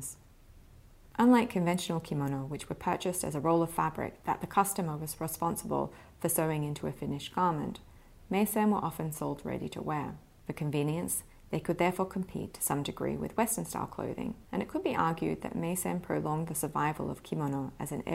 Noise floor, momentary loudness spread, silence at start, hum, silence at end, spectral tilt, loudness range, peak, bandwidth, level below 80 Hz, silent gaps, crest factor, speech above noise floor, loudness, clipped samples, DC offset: -56 dBFS; 9 LU; 0 s; none; 0 s; -5.5 dB/octave; 3 LU; -12 dBFS; 16 kHz; -58 dBFS; none; 20 dB; 24 dB; -33 LUFS; under 0.1%; under 0.1%